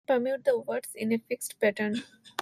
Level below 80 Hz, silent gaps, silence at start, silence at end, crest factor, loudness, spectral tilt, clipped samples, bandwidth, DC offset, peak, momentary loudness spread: -76 dBFS; none; 0.1 s; 0 s; 16 dB; -30 LUFS; -4 dB/octave; under 0.1%; 15.5 kHz; under 0.1%; -14 dBFS; 8 LU